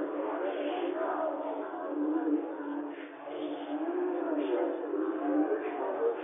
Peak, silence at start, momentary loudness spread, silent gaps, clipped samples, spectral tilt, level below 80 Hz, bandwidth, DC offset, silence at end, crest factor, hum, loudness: -18 dBFS; 0 s; 7 LU; none; under 0.1%; 1 dB/octave; under -90 dBFS; 3.7 kHz; under 0.1%; 0 s; 14 dB; none; -33 LUFS